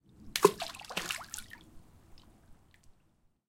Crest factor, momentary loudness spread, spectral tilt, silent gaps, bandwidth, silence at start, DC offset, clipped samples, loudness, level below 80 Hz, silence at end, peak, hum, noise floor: 32 dB; 20 LU; -3 dB/octave; none; 17 kHz; 0.2 s; under 0.1%; under 0.1%; -33 LUFS; -62 dBFS; 0.55 s; -6 dBFS; none; -70 dBFS